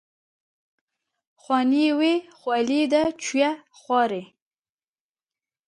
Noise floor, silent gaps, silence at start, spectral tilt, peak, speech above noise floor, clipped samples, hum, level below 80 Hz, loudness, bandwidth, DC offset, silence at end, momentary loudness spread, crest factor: under -90 dBFS; none; 1.5 s; -3.5 dB/octave; -8 dBFS; over 68 dB; under 0.1%; none; -66 dBFS; -23 LUFS; 11 kHz; under 0.1%; 1.4 s; 7 LU; 18 dB